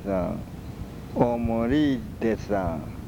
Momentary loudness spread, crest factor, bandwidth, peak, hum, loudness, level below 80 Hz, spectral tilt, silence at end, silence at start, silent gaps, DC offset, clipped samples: 15 LU; 18 dB; 19.5 kHz; -8 dBFS; none; -26 LUFS; -42 dBFS; -8 dB/octave; 0 s; 0 s; none; under 0.1%; under 0.1%